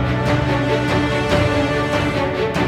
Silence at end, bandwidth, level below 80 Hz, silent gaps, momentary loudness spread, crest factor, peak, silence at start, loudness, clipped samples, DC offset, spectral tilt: 0 s; 14 kHz; -32 dBFS; none; 2 LU; 14 dB; -4 dBFS; 0 s; -18 LUFS; under 0.1%; under 0.1%; -6.5 dB/octave